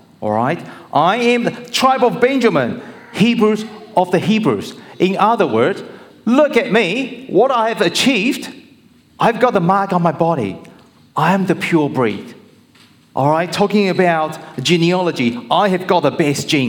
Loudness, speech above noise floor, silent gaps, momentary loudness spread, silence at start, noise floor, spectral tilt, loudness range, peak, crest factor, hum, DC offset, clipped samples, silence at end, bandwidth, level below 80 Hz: -16 LUFS; 33 dB; none; 10 LU; 0.2 s; -48 dBFS; -5.5 dB/octave; 2 LU; -2 dBFS; 14 dB; none; under 0.1%; under 0.1%; 0 s; 18 kHz; -62 dBFS